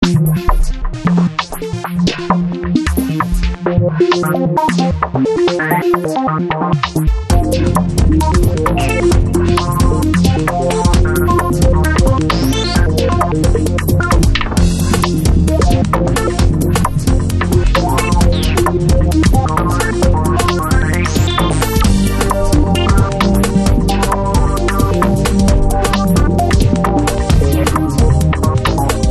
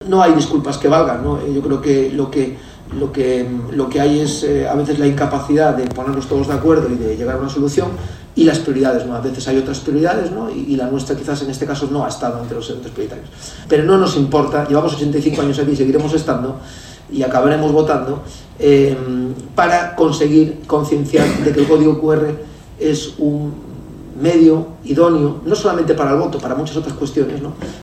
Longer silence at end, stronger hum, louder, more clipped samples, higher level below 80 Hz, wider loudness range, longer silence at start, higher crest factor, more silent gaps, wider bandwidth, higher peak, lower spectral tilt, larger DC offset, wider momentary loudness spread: about the same, 0 s vs 0 s; neither; about the same, -14 LUFS vs -16 LUFS; neither; first, -18 dBFS vs -40 dBFS; about the same, 2 LU vs 4 LU; about the same, 0 s vs 0 s; about the same, 12 dB vs 16 dB; neither; about the same, 13 kHz vs 13.5 kHz; about the same, 0 dBFS vs 0 dBFS; about the same, -6 dB/octave vs -6.5 dB/octave; neither; second, 3 LU vs 13 LU